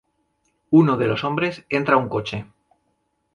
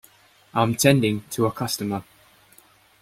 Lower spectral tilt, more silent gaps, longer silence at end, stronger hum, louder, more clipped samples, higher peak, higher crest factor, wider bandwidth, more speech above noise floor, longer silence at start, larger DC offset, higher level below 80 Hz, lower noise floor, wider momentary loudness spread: first, -7.5 dB/octave vs -5 dB/octave; neither; about the same, 0.9 s vs 1 s; neither; about the same, -20 LUFS vs -22 LUFS; neither; about the same, -2 dBFS vs -4 dBFS; about the same, 20 dB vs 22 dB; second, 7 kHz vs 16.5 kHz; first, 51 dB vs 34 dB; first, 0.7 s vs 0.55 s; neither; about the same, -56 dBFS vs -58 dBFS; first, -70 dBFS vs -55 dBFS; about the same, 11 LU vs 11 LU